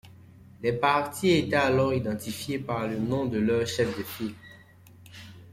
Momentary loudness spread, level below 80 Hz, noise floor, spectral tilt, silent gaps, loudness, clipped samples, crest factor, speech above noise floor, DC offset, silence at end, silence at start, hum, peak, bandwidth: 13 LU; -58 dBFS; -52 dBFS; -5.5 dB/octave; none; -27 LUFS; under 0.1%; 18 dB; 26 dB; under 0.1%; 0 s; 0.05 s; none; -10 dBFS; 16.5 kHz